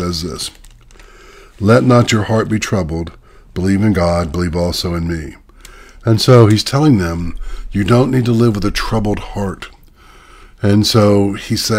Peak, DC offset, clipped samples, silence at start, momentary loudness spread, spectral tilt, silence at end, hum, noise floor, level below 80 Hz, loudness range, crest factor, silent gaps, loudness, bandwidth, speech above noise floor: 0 dBFS; under 0.1%; under 0.1%; 0 s; 15 LU; -6 dB/octave; 0 s; none; -42 dBFS; -32 dBFS; 4 LU; 14 dB; none; -14 LUFS; 16 kHz; 29 dB